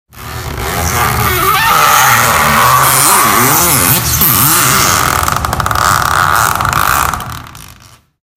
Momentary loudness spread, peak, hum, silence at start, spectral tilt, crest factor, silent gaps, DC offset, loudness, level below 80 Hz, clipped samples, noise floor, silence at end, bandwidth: 11 LU; 0 dBFS; none; 0.15 s; -2 dB/octave; 10 dB; none; under 0.1%; -8 LUFS; -30 dBFS; 0.4%; -40 dBFS; 0.65 s; over 20 kHz